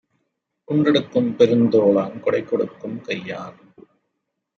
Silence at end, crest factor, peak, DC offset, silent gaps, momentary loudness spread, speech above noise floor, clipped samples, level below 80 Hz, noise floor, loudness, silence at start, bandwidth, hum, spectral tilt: 1.05 s; 18 dB; -2 dBFS; under 0.1%; none; 16 LU; 58 dB; under 0.1%; -66 dBFS; -77 dBFS; -19 LUFS; 0.7 s; 6.8 kHz; none; -7.5 dB/octave